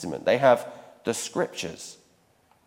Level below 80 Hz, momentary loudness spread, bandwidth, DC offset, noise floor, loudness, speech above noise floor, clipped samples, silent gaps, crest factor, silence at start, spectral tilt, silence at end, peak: -66 dBFS; 21 LU; 16.5 kHz; under 0.1%; -63 dBFS; -25 LUFS; 38 dB; under 0.1%; none; 22 dB; 0 s; -4 dB/octave; 0.75 s; -6 dBFS